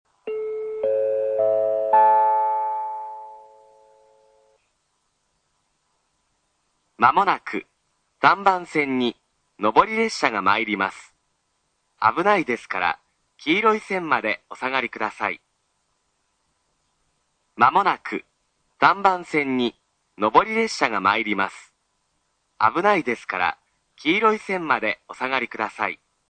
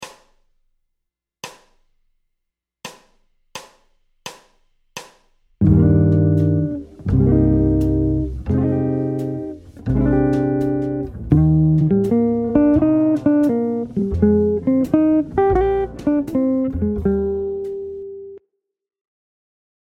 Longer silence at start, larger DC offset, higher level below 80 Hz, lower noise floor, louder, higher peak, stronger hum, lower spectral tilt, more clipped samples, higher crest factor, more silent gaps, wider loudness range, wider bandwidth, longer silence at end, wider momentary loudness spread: first, 0.25 s vs 0 s; neither; second, -64 dBFS vs -32 dBFS; second, -71 dBFS vs -79 dBFS; second, -21 LUFS vs -18 LUFS; about the same, 0 dBFS vs 0 dBFS; neither; second, -4.5 dB/octave vs -9.5 dB/octave; neither; first, 24 dB vs 18 dB; neither; about the same, 5 LU vs 5 LU; about the same, 9.4 kHz vs 9.8 kHz; second, 0.35 s vs 1.45 s; second, 11 LU vs 22 LU